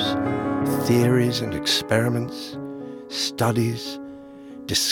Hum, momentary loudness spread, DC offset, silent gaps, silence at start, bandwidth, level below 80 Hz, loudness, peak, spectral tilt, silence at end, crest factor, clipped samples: none; 17 LU; under 0.1%; none; 0 s; 18 kHz; -56 dBFS; -23 LUFS; -4 dBFS; -4.5 dB/octave; 0 s; 18 dB; under 0.1%